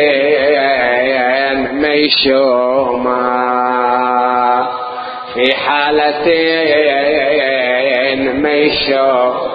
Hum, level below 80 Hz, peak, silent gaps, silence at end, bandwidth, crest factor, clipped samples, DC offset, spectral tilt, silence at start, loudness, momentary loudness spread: none; -48 dBFS; 0 dBFS; none; 0 s; 5.2 kHz; 12 dB; under 0.1%; under 0.1%; -6.5 dB/octave; 0 s; -12 LUFS; 4 LU